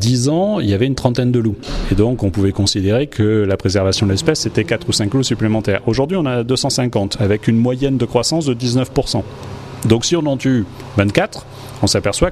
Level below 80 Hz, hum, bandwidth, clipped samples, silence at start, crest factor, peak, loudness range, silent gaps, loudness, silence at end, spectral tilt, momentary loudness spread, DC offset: -34 dBFS; none; 13.5 kHz; under 0.1%; 0 s; 16 dB; 0 dBFS; 2 LU; none; -16 LUFS; 0 s; -5.5 dB/octave; 5 LU; under 0.1%